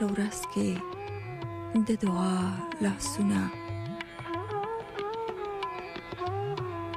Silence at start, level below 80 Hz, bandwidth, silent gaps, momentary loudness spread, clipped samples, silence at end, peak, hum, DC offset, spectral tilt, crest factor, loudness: 0 s; -56 dBFS; 14.5 kHz; none; 10 LU; under 0.1%; 0 s; -16 dBFS; none; under 0.1%; -5.5 dB/octave; 16 dB; -32 LUFS